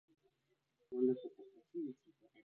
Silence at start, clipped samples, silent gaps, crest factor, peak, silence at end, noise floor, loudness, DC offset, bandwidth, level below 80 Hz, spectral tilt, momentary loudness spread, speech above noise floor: 0.9 s; under 0.1%; none; 20 dB; -24 dBFS; 0.55 s; -83 dBFS; -41 LUFS; under 0.1%; 3.8 kHz; under -90 dBFS; -9 dB/octave; 21 LU; 41 dB